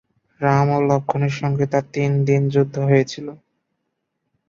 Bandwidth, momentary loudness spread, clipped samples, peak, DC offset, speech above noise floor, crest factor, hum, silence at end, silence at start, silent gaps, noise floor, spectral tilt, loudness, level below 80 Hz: 7.2 kHz; 6 LU; under 0.1%; -2 dBFS; under 0.1%; 57 dB; 18 dB; none; 1.15 s; 0.4 s; none; -75 dBFS; -7.5 dB/octave; -19 LUFS; -58 dBFS